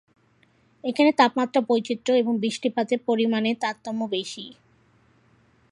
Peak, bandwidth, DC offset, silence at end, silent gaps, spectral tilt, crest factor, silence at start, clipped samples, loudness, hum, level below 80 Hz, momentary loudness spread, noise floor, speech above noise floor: -4 dBFS; 11 kHz; under 0.1%; 1.2 s; none; -4.5 dB/octave; 22 dB; 0.85 s; under 0.1%; -23 LUFS; none; -74 dBFS; 11 LU; -62 dBFS; 39 dB